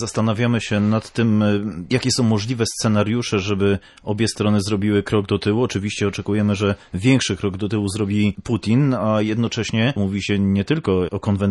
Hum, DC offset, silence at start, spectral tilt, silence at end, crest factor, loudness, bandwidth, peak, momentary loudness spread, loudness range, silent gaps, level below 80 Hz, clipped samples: none; under 0.1%; 0 s; -6 dB/octave; 0 s; 16 dB; -20 LUFS; 12 kHz; -4 dBFS; 4 LU; 1 LU; none; -48 dBFS; under 0.1%